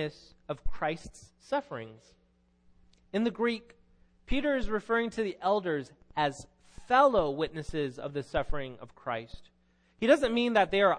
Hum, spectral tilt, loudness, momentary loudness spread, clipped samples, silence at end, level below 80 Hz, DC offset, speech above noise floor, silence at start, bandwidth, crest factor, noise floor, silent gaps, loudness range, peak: none; -5.5 dB/octave; -30 LUFS; 17 LU; under 0.1%; 0 s; -46 dBFS; under 0.1%; 37 dB; 0 s; 10.5 kHz; 20 dB; -67 dBFS; none; 7 LU; -10 dBFS